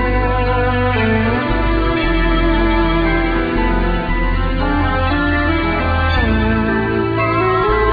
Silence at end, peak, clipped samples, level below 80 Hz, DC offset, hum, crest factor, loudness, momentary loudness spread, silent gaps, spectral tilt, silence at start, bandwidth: 0 s; -4 dBFS; under 0.1%; -20 dBFS; under 0.1%; none; 12 dB; -16 LUFS; 2 LU; none; -9 dB/octave; 0 s; 5 kHz